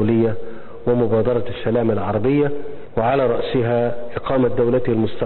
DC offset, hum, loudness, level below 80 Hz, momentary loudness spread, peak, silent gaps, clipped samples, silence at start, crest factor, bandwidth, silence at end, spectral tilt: 3%; none; -20 LUFS; -42 dBFS; 9 LU; -6 dBFS; none; under 0.1%; 0 s; 14 dB; 4.3 kHz; 0 s; -12.5 dB/octave